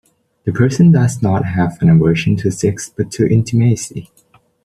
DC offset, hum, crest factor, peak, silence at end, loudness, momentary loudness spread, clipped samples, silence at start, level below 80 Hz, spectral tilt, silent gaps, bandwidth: under 0.1%; none; 12 dB; -2 dBFS; 0.6 s; -14 LUFS; 12 LU; under 0.1%; 0.45 s; -44 dBFS; -7 dB/octave; none; 12.5 kHz